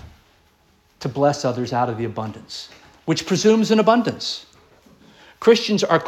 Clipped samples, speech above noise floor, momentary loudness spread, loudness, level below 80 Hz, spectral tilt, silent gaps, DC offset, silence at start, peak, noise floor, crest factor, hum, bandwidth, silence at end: under 0.1%; 39 dB; 17 LU; -19 LUFS; -58 dBFS; -5 dB/octave; none; under 0.1%; 0.05 s; -2 dBFS; -58 dBFS; 20 dB; none; 13 kHz; 0 s